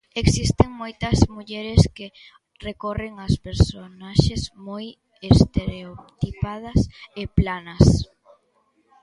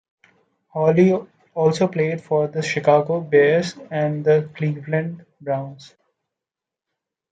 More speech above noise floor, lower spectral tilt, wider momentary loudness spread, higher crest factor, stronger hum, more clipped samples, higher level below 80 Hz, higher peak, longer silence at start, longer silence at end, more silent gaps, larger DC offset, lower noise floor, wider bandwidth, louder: second, 44 dB vs 68 dB; about the same, -6.5 dB/octave vs -7 dB/octave; first, 19 LU vs 11 LU; about the same, 22 dB vs 18 dB; neither; neither; first, -30 dBFS vs -68 dBFS; first, 0 dBFS vs -4 dBFS; second, 0.15 s vs 0.75 s; second, 1 s vs 1.45 s; neither; neither; second, -65 dBFS vs -87 dBFS; first, 11.5 kHz vs 9.2 kHz; about the same, -22 LUFS vs -20 LUFS